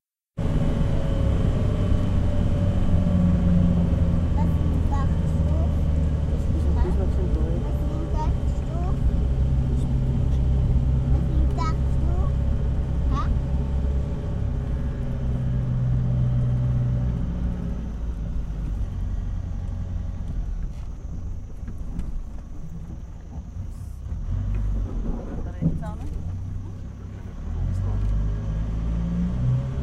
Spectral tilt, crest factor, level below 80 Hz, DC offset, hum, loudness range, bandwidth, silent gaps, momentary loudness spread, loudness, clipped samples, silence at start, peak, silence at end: -9 dB/octave; 14 dB; -26 dBFS; under 0.1%; none; 11 LU; 8 kHz; none; 13 LU; -25 LUFS; under 0.1%; 0.35 s; -8 dBFS; 0 s